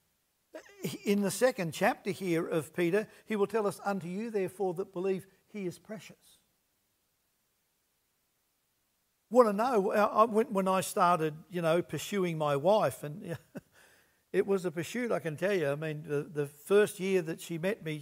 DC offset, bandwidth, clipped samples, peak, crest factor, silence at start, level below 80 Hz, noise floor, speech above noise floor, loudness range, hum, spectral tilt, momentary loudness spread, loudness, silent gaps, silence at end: under 0.1%; 16 kHz; under 0.1%; -8 dBFS; 24 dB; 0.55 s; -78 dBFS; -77 dBFS; 46 dB; 10 LU; none; -5.5 dB/octave; 14 LU; -31 LUFS; none; 0 s